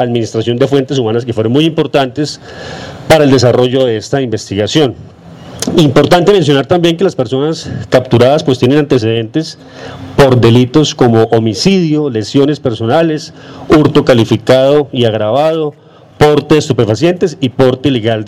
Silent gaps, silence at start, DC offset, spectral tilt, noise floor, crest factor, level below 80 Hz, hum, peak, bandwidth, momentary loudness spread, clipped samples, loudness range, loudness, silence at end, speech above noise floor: none; 0 s; under 0.1%; -6 dB/octave; -30 dBFS; 10 dB; -40 dBFS; none; 0 dBFS; 16 kHz; 11 LU; under 0.1%; 2 LU; -10 LUFS; 0 s; 20 dB